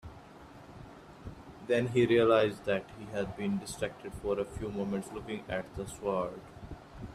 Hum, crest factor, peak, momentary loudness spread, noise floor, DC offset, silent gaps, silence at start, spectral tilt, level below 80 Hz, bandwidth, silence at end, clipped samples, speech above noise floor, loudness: none; 20 dB; -12 dBFS; 24 LU; -52 dBFS; under 0.1%; none; 0.05 s; -6 dB/octave; -56 dBFS; 14 kHz; 0 s; under 0.1%; 20 dB; -32 LUFS